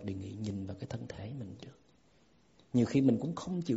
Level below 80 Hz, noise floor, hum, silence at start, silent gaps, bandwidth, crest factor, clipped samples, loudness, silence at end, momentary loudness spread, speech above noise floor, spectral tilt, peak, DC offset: -64 dBFS; -67 dBFS; none; 0 s; none; 8 kHz; 20 dB; under 0.1%; -34 LUFS; 0 s; 17 LU; 37 dB; -8 dB/octave; -14 dBFS; under 0.1%